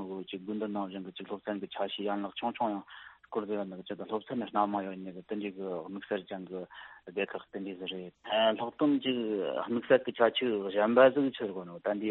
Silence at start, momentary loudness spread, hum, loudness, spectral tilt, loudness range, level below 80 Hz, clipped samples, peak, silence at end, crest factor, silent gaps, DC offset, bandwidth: 0 s; 14 LU; none; -32 LUFS; -3 dB/octave; 8 LU; -76 dBFS; under 0.1%; -10 dBFS; 0 s; 22 dB; none; under 0.1%; 4.2 kHz